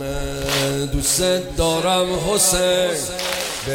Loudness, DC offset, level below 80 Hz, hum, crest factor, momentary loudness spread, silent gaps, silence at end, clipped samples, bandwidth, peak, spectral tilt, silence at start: -19 LUFS; under 0.1%; -34 dBFS; none; 16 dB; 7 LU; none; 0 s; under 0.1%; 17.5 kHz; -4 dBFS; -3 dB/octave; 0 s